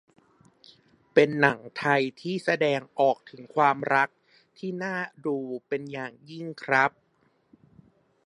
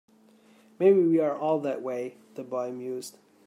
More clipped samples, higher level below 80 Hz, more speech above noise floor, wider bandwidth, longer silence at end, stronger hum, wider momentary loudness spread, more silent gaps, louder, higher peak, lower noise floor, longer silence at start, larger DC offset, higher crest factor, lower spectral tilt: neither; first, -74 dBFS vs -84 dBFS; first, 42 dB vs 32 dB; second, 11.5 kHz vs 13 kHz; first, 1.4 s vs 0.35 s; neither; second, 14 LU vs 17 LU; neither; about the same, -26 LUFS vs -27 LUFS; first, -2 dBFS vs -10 dBFS; first, -68 dBFS vs -58 dBFS; first, 1.15 s vs 0.8 s; neither; first, 26 dB vs 18 dB; about the same, -6 dB/octave vs -7 dB/octave